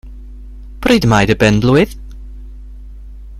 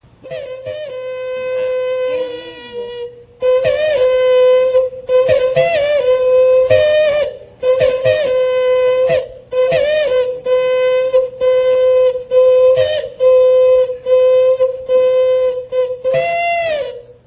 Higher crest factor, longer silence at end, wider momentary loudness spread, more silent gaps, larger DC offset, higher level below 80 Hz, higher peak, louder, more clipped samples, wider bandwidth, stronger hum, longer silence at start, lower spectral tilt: about the same, 16 dB vs 12 dB; second, 0 s vs 0.15 s; first, 24 LU vs 14 LU; neither; neither; first, -30 dBFS vs -48 dBFS; about the same, 0 dBFS vs 0 dBFS; about the same, -12 LUFS vs -13 LUFS; neither; first, 15 kHz vs 4 kHz; neither; second, 0.05 s vs 0.25 s; second, -6 dB/octave vs -7.5 dB/octave